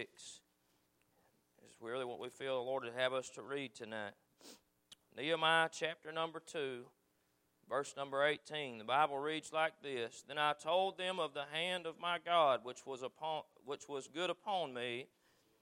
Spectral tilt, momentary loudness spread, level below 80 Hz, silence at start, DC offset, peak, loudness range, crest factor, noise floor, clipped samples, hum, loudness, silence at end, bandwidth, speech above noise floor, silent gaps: -3 dB/octave; 14 LU; under -90 dBFS; 0 s; under 0.1%; -18 dBFS; 6 LU; 22 dB; -79 dBFS; under 0.1%; none; -39 LUFS; 0.55 s; 16 kHz; 39 dB; none